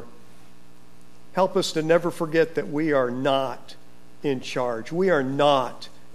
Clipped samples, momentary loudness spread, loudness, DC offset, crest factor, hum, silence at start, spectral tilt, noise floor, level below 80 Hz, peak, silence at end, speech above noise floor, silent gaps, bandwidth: under 0.1%; 11 LU; -24 LUFS; 2%; 18 dB; 60 Hz at -55 dBFS; 0 s; -5.5 dB/octave; -53 dBFS; -66 dBFS; -6 dBFS; 0.3 s; 30 dB; none; 14.5 kHz